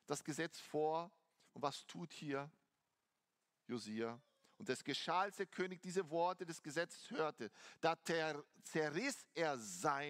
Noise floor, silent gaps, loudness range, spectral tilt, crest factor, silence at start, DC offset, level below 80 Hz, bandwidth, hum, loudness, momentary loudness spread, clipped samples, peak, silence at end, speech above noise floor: -89 dBFS; none; 6 LU; -4 dB/octave; 24 dB; 0.1 s; under 0.1%; under -90 dBFS; 16 kHz; none; -43 LUFS; 11 LU; under 0.1%; -20 dBFS; 0 s; 46 dB